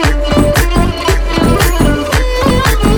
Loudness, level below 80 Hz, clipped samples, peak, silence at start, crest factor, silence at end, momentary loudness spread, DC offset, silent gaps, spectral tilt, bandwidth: -12 LUFS; -14 dBFS; under 0.1%; 0 dBFS; 0 s; 10 dB; 0 s; 3 LU; under 0.1%; none; -5 dB/octave; 19.5 kHz